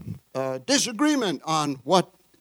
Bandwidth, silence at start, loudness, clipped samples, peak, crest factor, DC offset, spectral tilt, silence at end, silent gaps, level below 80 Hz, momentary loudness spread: 19.5 kHz; 0 s; -24 LUFS; under 0.1%; -4 dBFS; 20 dB; under 0.1%; -3.5 dB/octave; 0.35 s; none; -64 dBFS; 9 LU